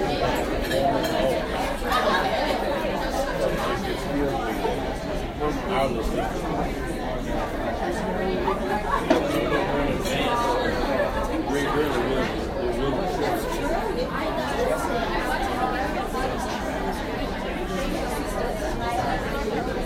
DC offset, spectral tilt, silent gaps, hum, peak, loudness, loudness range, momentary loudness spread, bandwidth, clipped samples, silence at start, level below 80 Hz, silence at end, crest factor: under 0.1%; -5 dB/octave; none; none; -6 dBFS; -25 LUFS; 3 LU; 5 LU; 16 kHz; under 0.1%; 0 s; -34 dBFS; 0 s; 20 dB